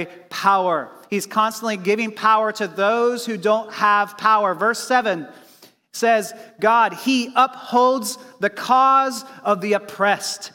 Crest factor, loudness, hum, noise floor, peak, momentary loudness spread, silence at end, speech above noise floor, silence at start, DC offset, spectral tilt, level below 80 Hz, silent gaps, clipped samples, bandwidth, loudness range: 16 dB; -19 LUFS; none; -51 dBFS; -4 dBFS; 9 LU; 0.05 s; 31 dB; 0 s; under 0.1%; -3.5 dB/octave; -76 dBFS; none; under 0.1%; 17 kHz; 2 LU